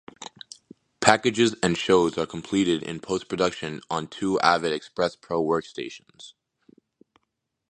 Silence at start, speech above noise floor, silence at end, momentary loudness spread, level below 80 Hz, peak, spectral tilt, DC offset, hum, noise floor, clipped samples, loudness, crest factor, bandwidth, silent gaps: 0.2 s; 55 dB; 1.4 s; 18 LU; -58 dBFS; 0 dBFS; -4 dB/octave; under 0.1%; none; -79 dBFS; under 0.1%; -24 LUFS; 26 dB; 11 kHz; none